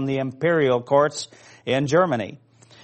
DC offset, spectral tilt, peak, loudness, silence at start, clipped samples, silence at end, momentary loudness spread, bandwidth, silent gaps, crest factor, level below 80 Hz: under 0.1%; -5.5 dB/octave; -6 dBFS; -21 LUFS; 0 s; under 0.1%; 0.5 s; 15 LU; 8.6 kHz; none; 18 dB; -64 dBFS